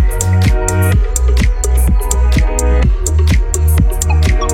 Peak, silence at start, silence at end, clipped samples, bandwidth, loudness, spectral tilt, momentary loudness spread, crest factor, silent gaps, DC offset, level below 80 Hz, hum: 0 dBFS; 0 s; 0 s; under 0.1%; 16.5 kHz; -13 LUFS; -5 dB/octave; 2 LU; 10 dB; none; under 0.1%; -12 dBFS; none